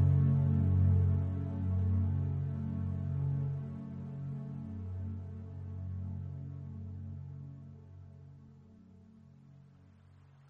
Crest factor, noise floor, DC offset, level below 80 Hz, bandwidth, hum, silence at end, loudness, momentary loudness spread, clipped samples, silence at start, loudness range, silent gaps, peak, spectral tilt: 16 dB; -59 dBFS; under 0.1%; -56 dBFS; 2.6 kHz; none; 0.95 s; -35 LUFS; 21 LU; under 0.1%; 0 s; 17 LU; none; -18 dBFS; -11.5 dB/octave